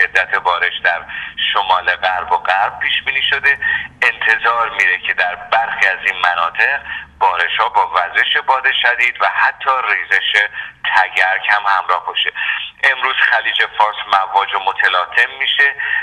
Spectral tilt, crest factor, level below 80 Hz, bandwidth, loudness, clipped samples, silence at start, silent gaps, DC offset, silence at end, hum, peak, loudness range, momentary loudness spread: -1 dB/octave; 16 dB; -52 dBFS; 12 kHz; -14 LUFS; under 0.1%; 0 s; none; under 0.1%; 0 s; none; 0 dBFS; 1 LU; 4 LU